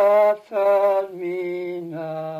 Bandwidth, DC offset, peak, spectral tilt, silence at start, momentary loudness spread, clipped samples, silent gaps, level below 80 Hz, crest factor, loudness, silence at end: 15 kHz; under 0.1%; -8 dBFS; -7 dB/octave; 0 s; 12 LU; under 0.1%; none; -82 dBFS; 12 dB; -22 LUFS; 0 s